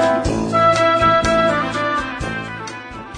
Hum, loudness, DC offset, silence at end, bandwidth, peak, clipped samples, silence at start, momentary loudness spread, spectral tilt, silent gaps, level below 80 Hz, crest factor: none; -16 LUFS; under 0.1%; 0 s; 10 kHz; -4 dBFS; under 0.1%; 0 s; 15 LU; -5 dB/octave; none; -36 dBFS; 14 dB